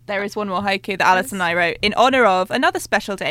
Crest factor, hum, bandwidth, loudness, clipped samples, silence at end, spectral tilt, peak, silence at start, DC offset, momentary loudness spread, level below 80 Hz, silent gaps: 16 dB; none; 16.5 kHz; -18 LUFS; under 0.1%; 0 s; -3.5 dB/octave; -2 dBFS; 0.1 s; under 0.1%; 8 LU; -50 dBFS; none